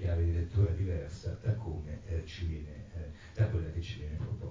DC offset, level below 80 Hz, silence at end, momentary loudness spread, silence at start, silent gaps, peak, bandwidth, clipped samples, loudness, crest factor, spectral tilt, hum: under 0.1%; -40 dBFS; 0 s; 13 LU; 0 s; none; -18 dBFS; 7.6 kHz; under 0.1%; -36 LUFS; 16 dB; -8 dB/octave; none